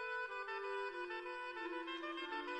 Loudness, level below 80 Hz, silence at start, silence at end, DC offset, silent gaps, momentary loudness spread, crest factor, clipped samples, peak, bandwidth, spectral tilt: -44 LUFS; -82 dBFS; 0 s; 0 s; under 0.1%; none; 2 LU; 12 dB; under 0.1%; -32 dBFS; 10.5 kHz; -2.5 dB/octave